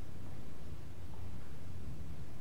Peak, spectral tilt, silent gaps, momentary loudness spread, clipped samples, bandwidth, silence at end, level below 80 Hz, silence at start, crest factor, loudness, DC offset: -28 dBFS; -6.5 dB/octave; none; 2 LU; under 0.1%; 16 kHz; 0 s; -54 dBFS; 0 s; 12 dB; -50 LUFS; 2%